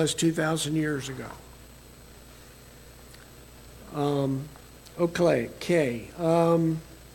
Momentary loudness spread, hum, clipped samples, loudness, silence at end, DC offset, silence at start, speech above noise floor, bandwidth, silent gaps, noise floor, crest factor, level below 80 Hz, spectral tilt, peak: 25 LU; 60 Hz at -60 dBFS; under 0.1%; -27 LUFS; 0 s; under 0.1%; 0 s; 23 dB; 17 kHz; none; -49 dBFS; 18 dB; -54 dBFS; -5.5 dB/octave; -10 dBFS